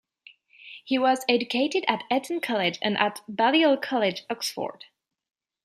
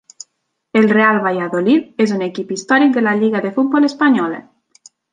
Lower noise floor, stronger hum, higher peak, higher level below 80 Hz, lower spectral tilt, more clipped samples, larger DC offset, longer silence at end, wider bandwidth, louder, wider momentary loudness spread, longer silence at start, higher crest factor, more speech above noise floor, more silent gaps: second, -55 dBFS vs -71 dBFS; neither; about the same, -4 dBFS vs -2 dBFS; second, -78 dBFS vs -66 dBFS; second, -3.5 dB/octave vs -5.5 dB/octave; neither; neither; first, 0.95 s vs 0.7 s; first, 14.5 kHz vs 9.6 kHz; second, -25 LUFS vs -15 LUFS; about the same, 9 LU vs 9 LU; about the same, 0.65 s vs 0.75 s; first, 22 dB vs 14 dB; second, 31 dB vs 56 dB; neither